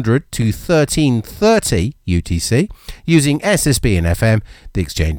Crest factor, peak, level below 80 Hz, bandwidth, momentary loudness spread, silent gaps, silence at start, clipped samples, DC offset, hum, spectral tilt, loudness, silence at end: 14 dB; 0 dBFS; -28 dBFS; 19 kHz; 7 LU; none; 0 s; under 0.1%; under 0.1%; none; -5.5 dB/octave; -16 LUFS; 0 s